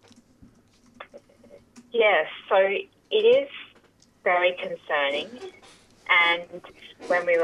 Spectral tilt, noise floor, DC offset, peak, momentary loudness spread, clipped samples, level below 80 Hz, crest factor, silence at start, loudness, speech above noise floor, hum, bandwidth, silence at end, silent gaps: -3.5 dB/octave; -59 dBFS; under 0.1%; -8 dBFS; 22 LU; under 0.1%; -70 dBFS; 18 dB; 1 s; -23 LUFS; 36 dB; none; 10.5 kHz; 0 s; none